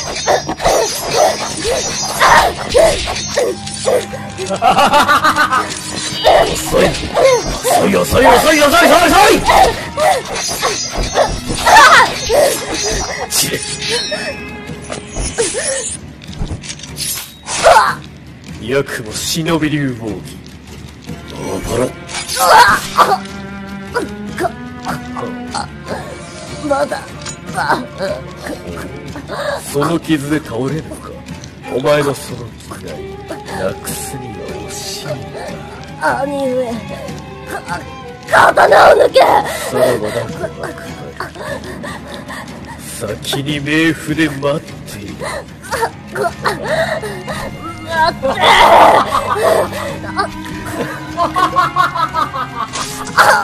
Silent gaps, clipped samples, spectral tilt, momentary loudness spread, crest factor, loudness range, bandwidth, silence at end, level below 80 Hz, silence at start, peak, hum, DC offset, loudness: none; 0.2%; -3 dB/octave; 19 LU; 14 dB; 11 LU; 15 kHz; 0 s; -34 dBFS; 0 s; 0 dBFS; none; under 0.1%; -13 LUFS